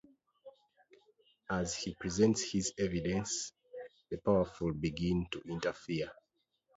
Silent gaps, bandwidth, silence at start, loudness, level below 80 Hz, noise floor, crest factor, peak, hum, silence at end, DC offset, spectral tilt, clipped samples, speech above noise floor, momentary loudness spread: none; 7.6 kHz; 0.45 s; -35 LUFS; -56 dBFS; -80 dBFS; 20 dB; -16 dBFS; none; 0.65 s; under 0.1%; -5.5 dB/octave; under 0.1%; 46 dB; 14 LU